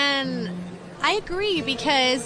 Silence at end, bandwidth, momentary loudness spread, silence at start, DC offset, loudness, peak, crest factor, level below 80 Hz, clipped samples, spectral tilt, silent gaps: 0 s; 11 kHz; 13 LU; 0 s; under 0.1%; -23 LUFS; -8 dBFS; 16 dB; -48 dBFS; under 0.1%; -3.5 dB/octave; none